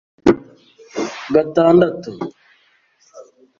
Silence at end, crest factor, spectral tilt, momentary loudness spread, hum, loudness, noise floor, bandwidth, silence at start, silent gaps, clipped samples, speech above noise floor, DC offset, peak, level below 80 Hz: 0.35 s; 18 dB; -7 dB/octave; 18 LU; none; -17 LUFS; -58 dBFS; 7.4 kHz; 0.25 s; none; under 0.1%; 43 dB; under 0.1%; -2 dBFS; -50 dBFS